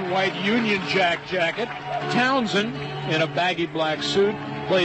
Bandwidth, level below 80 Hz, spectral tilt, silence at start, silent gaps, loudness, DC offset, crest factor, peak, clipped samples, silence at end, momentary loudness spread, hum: 8.6 kHz; -58 dBFS; -5 dB/octave; 0 s; none; -23 LUFS; under 0.1%; 14 dB; -8 dBFS; under 0.1%; 0 s; 8 LU; none